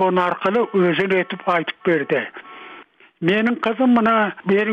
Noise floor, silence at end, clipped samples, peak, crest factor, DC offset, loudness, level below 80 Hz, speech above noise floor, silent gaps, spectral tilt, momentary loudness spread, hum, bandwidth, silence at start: -44 dBFS; 0 s; under 0.1%; -6 dBFS; 14 dB; under 0.1%; -19 LUFS; -64 dBFS; 26 dB; none; -7.5 dB/octave; 15 LU; none; 6.8 kHz; 0 s